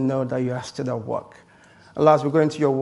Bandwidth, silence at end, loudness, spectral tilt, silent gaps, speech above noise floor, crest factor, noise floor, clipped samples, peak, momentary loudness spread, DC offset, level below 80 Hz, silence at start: 11.5 kHz; 0 s; -22 LUFS; -7 dB/octave; none; 30 dB; 20 dB; -51 dBFS; under 0.1%; -2 dBFS; 13 LU; under 0.1%; -62 dBFS; 0 s